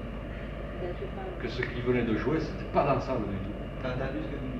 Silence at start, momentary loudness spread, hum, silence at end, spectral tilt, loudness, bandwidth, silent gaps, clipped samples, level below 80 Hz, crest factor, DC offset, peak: 0 s; 11 LU; none; 0 s; -8 dB/octave; -32 LUFS; 7.6 kHz; none; under 0.1%; -40 dBFS; 18 dB; under 0.1%; -14 dBFS